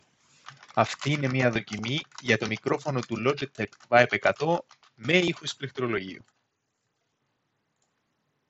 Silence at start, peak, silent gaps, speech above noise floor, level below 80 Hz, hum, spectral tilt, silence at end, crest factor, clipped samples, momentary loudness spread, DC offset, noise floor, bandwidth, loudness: 0.45 s; -4 dBFS; none; 51 dB; -68 dBFS; none; -5 dB/octave; 2.3 s; 26 dB; under 0.1%; 10 LU; under 0.1%; -78 dBFS; 8.2 kHz; -27 LUFS